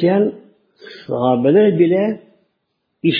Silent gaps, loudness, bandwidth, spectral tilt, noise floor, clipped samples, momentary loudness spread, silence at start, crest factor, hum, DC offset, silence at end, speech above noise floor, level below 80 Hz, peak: none; -16 LUFS; 5.2 kHz; -10 dB/octave; -71 dBFS; under 0.1%; 14 LU; 0 s; 14 dB; none; under 0.1%; 0 s; 56 dB; -64 dBFS; -2 dBFS